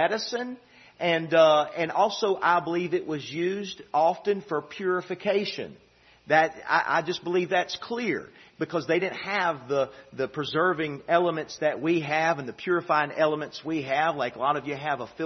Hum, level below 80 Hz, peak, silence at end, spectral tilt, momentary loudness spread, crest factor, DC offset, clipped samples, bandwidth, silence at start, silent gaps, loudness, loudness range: none; -70 dBFS; -6 dBFS; 0 s; -5 dB/octave; 9 LU; 20 dB; under 0.1%; under 0.1%; 6.4 kHz; 0 s; none; -26 LUFS; 4 LU